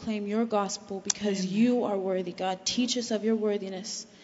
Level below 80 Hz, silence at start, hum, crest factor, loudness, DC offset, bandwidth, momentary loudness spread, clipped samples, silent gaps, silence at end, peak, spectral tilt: -68 dBFS; 0 s; none; 22 dB; -29 LUFS; under 0.1%; 8 kHz; 8 LU; under 0.1%; none; 0 s; -8 dBFS; -4 dB/octave